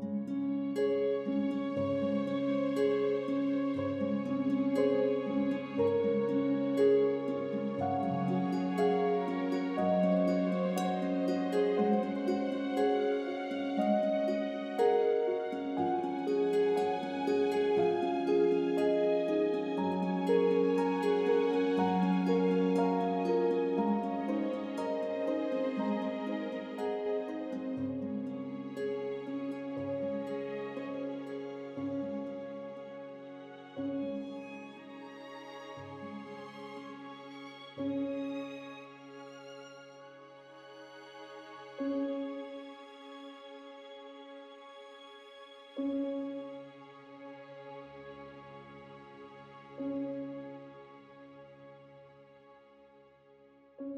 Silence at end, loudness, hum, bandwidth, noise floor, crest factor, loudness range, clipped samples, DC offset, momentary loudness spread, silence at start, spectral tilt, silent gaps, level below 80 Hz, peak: 0 s; -32 LUFS; none; 11.5 kHz; -61 dBFS; 16 dB; 15 LU; under 0.1%; under 0.1%; 21 LU; 0 s; -7.5 dB/octave; none; -78 dBFS; -16 dBFS